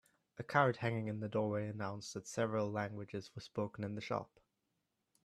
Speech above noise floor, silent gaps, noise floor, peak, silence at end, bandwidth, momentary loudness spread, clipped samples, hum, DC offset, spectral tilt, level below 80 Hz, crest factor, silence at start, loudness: 47 dB; none; -85 dBFS; -16 dBFS; 1 s; 12.5 kHz; 13 LU; under 0.1%; none; under 0.1%; -6 dB/octave; -76 dBFS; 24 dB; 0.35 s; -39 LUFS